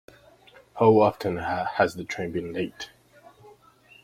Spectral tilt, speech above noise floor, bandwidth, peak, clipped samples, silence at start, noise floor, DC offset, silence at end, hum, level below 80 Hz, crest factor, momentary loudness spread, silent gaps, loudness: -6.5 dB/octave; 32 dB; 15 kHz; -6 dBFS; under 0.1%; 0.75 s; -56 dBFS; under 0.1%; 0.55 s; none; -60 dBFS; 20 dB; 19 LU; none; -25 LUFS